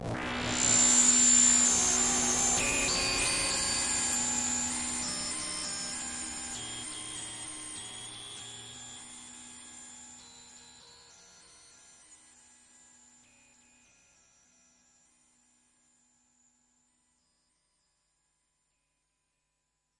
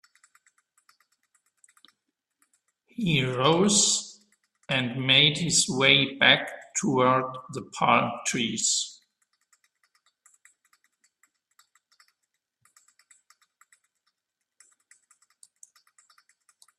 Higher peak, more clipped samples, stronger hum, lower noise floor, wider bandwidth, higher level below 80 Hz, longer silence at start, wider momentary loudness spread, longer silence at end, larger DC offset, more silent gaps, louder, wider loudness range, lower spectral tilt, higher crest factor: second, -12 dBFS vs -2 dBFS; neither; neither; second, -81 dBFS vs -85 dBFS; second, 12 kHz vs 13.5 kHz; first, -56 dBFS vs -66 dBFS; second, 0 s vs 3 s; first, 25 LU vs 14 LU; about the same, 7.85 s vs 7.85 s; neither; neither; second, -26 LUFS vs -22 LUFS; first, 25 LU vs 11 LU; second, -0.5 dB/octave vs -2.5 dB/octave; about the same, 22 dB vs 26 dB